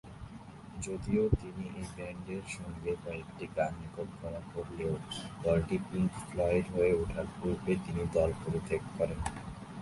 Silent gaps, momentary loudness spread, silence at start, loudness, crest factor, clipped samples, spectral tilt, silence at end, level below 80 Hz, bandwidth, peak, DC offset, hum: none; 12 LU; 0.05 s; -35 LUFS; 22 dB; under 0.1%; -6.5 dB/octave; 0 s; -48 dBFS; 11.5 kHz; -12 dBFS; under 0.1%; none